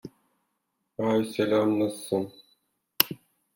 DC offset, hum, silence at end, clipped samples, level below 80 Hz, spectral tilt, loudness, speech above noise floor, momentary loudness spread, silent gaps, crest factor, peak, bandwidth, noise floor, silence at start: under 0.1%; none; 0.4 s; under 0.1%; -70 dBFS; -4.5 dB/octave; -26 LUFS; 53 dB; 14 LU; none; 30 dB; 0 dBFS; 17 kHz; -79 dBFS; 0.05 s